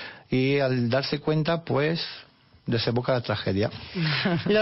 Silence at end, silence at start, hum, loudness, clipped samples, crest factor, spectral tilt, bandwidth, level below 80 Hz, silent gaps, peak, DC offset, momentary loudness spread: 0 s; 0 s; none; -26 LUFS; under 0.1%; 12 dB; -9.5 dB/octave; 6 kHz; -58 dBFS; none; -12 dBFS; under 0.1%; 6 LU